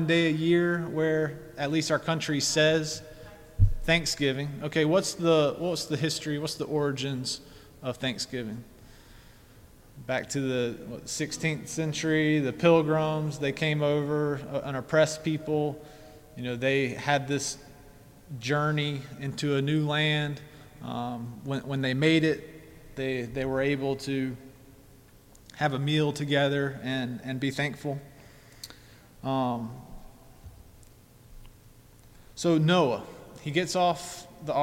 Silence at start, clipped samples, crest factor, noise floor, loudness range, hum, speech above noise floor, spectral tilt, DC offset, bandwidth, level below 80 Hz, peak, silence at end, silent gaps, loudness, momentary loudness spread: 0 s; under 0.1%; 20 dB; -54 dBFS; 8 LU; none; 27 dB; -5 dB/octave; under 0.1%; 16.5 kHz; -46 dBFS; -8 dBFS; 0 s; none; -28 LUFS; 15 LU